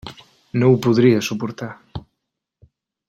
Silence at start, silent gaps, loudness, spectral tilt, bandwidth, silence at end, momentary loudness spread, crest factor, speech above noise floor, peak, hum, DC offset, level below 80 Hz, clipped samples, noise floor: 0.05 s; none; -18 LUFS; -7 dB/octave; 14 kHz; 1.1 s; 22 LU; 18 dB; 62 dB; -2 dBFS; none; under 0.1%; -52 dBFS; under 0.1%; -79 dBFS